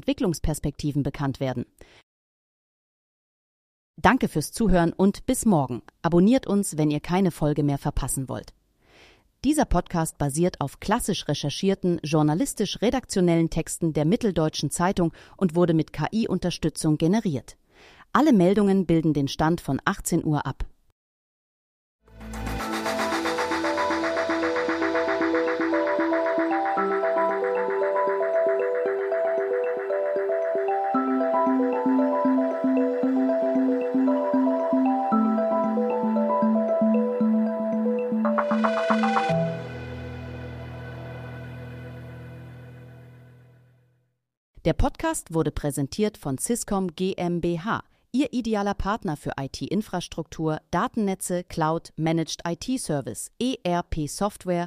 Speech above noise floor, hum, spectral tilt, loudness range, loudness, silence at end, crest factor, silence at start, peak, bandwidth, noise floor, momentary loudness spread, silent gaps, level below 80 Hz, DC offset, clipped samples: 45 dB; none; -6 dB/octave; 8 LU; -24 LUFS; 0 s; 20 dB; 0.05 s; -4 dBFS; 15.5 kHz; -69 dBFS; 9 LU; 2.03-3.94 s, 20.92-21.99 s, 44.37-44.54 s; -42 dBFS; under 0.1%; under 0.1%